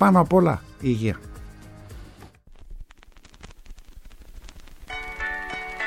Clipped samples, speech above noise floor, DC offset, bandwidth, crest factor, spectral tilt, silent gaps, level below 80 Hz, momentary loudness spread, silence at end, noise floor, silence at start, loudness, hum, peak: under 0.1%; 30 dB; under 0.1%; 14 kHz; 20 dB; -7.5 dB/octave; none; -44 dBFS; 28 LU; 0 s; -49 dBFS; 0 s; -24 LUFS; none; -6 dBFS